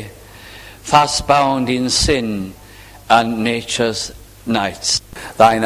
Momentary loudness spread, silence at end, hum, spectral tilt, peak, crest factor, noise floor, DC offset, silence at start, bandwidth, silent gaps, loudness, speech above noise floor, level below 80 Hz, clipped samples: 18 LU; 0 s; none; -3.5 dB/octave; 0 dBFS; 18 dB; -39 dBFS; under 0.1%; 0 s; 16 kHz; none; -16 LUFS; 23 dB; -36 dBFS; under 0.1%